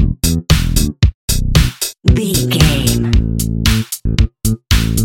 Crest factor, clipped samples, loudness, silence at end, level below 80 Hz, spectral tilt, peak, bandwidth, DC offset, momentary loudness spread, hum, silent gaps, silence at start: 14 dB; 0.2%; -15 LUFS; 0 s; -18 dBFS; -4.5 dB/octave; 0 dBFS; 17.5 kHz; under 0.1%; 5 LU; none; 1.14-1.28 s; 0 s